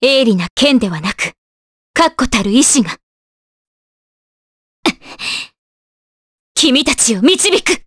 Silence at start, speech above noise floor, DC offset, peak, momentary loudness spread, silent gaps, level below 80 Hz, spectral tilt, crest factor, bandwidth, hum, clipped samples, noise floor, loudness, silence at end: 0 s; over 78 dB; under 0.1%; 0 dBFS; 11 LU; 0.50-0.56 s, 1.38-1.94 s, 3.03-4.83 s, 5.58-6.55 s; -42 dBFS; -2.5 dB/octave; 16 dB; 11 kHz; none; under 0.1%; under -90 dBFS; -13 LUFS; 0.05 s